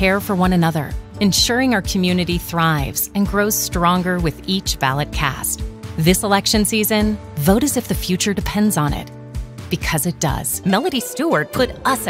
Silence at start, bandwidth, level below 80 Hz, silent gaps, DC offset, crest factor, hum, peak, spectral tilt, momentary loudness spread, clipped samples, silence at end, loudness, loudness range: 0 s; 16.5 kHz; -32 dBFS; none; under 0.1%; 16 dB; none; -2 dBFS; -4 dB/octave; 7 LU; under 0.1%; 0 s; -18 LUFS; 3 LU